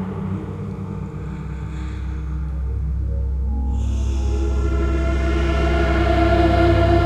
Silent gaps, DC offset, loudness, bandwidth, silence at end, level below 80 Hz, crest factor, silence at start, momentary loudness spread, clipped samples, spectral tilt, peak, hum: none; under 0.1%; -22 LUFS; 8.2 kHz; 0 s; -22 dBFS; 16 dB; 0 s; 13 LU; under 0.1%; -7.5 dB/octave; -4 dBFS; none